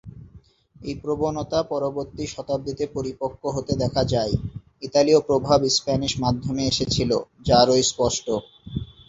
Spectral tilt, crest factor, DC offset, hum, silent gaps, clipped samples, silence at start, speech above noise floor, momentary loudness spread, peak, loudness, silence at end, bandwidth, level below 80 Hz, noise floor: -5 dB/octave; 20 dB; under 0.1%; none; none; under 0.1%; 0.05 s; 28 dB; 14 LU; -4 dBFS; -23 LUFS; 0.2 s; 8 kHz; -44 dBFS; -51 dBFS